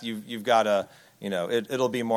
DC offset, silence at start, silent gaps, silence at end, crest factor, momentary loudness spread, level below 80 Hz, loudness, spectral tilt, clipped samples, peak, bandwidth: under 0.1%; 0 s; none; 0 s; 18 dB; 13 LU; -74 dBFS; -26 LUFS; -4.5 dB/octave; under 0.1%; -8 dBFS; 16.5 kHz